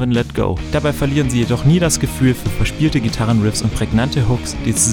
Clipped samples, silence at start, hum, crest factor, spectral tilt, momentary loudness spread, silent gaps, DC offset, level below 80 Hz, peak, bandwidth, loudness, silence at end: under 0.1%; 0 s; none; 14 dB; -5 dB/octave; 5 LU; none; under 0.1%; -28 dBFS; -2 dBFS; 18 kHz; -17 LUFS; 0 s